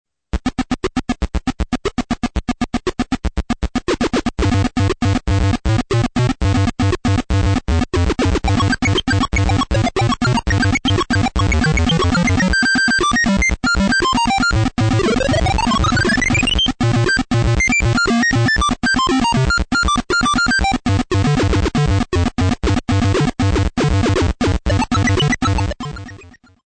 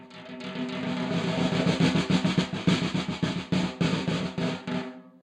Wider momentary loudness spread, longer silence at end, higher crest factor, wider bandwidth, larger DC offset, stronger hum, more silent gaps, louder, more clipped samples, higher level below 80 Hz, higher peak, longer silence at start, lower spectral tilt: second, 7 LU vs 10 LU; first, 0.4 s vs 0.15 s; second, 10 dB vs 18 dB; about the same, 9.2 kHz vs 10 kHz; neither; neither; neither; first, -16 LUFS vs -27 LUFS; neither; first, -26 dBFS vs -56 dBFS; first, -6 dBFS vs -10 dBFS; first, 0.35 s vs 0 s; about the same, -5 dB/octave vs -6 dB/octave